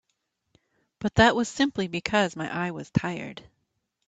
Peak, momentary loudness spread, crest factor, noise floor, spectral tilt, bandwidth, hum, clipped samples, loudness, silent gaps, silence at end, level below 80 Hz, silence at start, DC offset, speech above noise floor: -6 dBFS; 14 LU; 22 dB; -77 dBFS; -5 dB/octave; 9.2 kHz; none; under 0.1%; -25 LUFS; none; 0.7 s; -52 dBFS; 1 s; under 0.1%; 52 dB